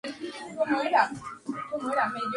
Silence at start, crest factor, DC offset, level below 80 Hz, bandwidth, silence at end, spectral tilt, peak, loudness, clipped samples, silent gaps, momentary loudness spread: 0.05 s; 20 dB; under 0.1%; -68 dBFS; 11.5 kHz; 0 s; -4.5 dB/octave; -8 dBFS; -29 LUFS; under 0.1%; none; 14 LU